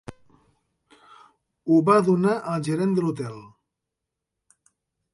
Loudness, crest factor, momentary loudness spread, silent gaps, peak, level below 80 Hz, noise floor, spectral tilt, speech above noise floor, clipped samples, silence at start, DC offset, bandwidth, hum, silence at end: -22 LUFS; 20 dB; 18 LU; none; -6 dBFS; -66 dBFS; -84 dBFS; -7.5 dB/octave; 63 dB; under 0.1%; 0.1 s; under 0.1%; 11.5 kHz; none; 1.65 s